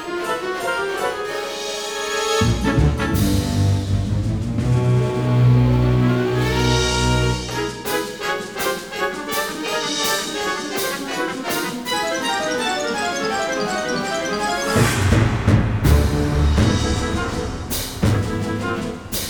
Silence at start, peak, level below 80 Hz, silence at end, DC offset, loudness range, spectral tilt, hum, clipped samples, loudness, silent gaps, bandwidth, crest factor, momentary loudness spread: 0 s; -2 dBFS; -28 dBFS; 0 s; 0.2%; 4 LU; -5 dB/octave; none; under 0.1%; -20 LUFS; none; over 20 kHz; 18 dB; 7 LU